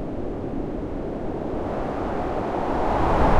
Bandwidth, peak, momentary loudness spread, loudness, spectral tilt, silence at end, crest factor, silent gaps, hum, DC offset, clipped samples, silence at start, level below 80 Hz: 9.2 kHz; -6 dBFS; 8 LU; -27 LUFS; -8 dB/octave; 0 s; 18 dB; none; none; under 0.1%; under 0.1%; 0 s; -32 dBFS